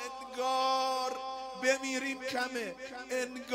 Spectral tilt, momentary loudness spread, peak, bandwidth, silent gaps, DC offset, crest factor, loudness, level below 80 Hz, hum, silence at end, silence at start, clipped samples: -1.5 dB/octave; 11 LU; -16 dBFS; 16 kHz; none; under 0.1%; 18 dB; -34 LUFS; -72 dBFS; none; 0 s; 0 s; under 0.1%